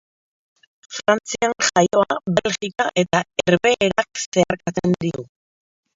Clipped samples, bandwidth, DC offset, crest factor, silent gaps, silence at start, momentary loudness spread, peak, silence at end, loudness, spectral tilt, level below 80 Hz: under 0.1%; 7.8 kHz; under 0.1%; 20 dB; 4.26-4.32 s; 0.9 s; 7 LU; -2 dBFS; 0.7 s; -20 LUFS; -4 dB/octave; -54 dBFS